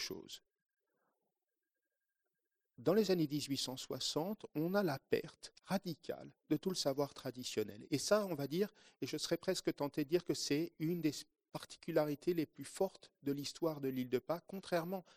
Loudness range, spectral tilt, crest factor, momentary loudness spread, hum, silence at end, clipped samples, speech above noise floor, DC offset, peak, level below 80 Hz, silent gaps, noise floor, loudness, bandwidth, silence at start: 2 LU; -5 dB/octave; 22 dB; 12 LU; none; 0.15 s; under 0.1%; over 51 dB; under 0.1%; -18 dBFS; -76 dBFS; 0.62-0.66 s; under -90 dBFS; -39 LUFS; 15 kHz; 0 s